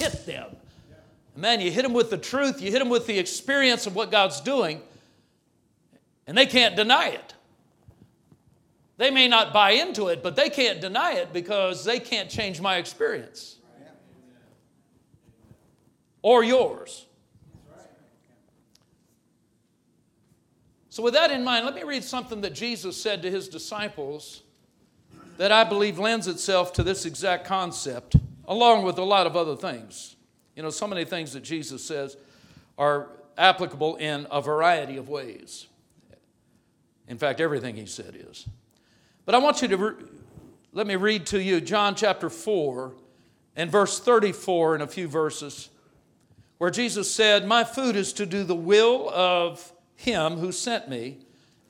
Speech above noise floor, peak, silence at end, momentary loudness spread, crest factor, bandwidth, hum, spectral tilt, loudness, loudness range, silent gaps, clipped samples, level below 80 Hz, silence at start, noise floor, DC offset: 43 dB; 0 dBFS; 0.55 s; 19 LU; 24 dB; 16 kHz; none; -3.5 dB/octave; -23 LUFS; 9 LU; none; under 0.1%; -50 dBFS; 0 s; -67 dBFS; under 0.1%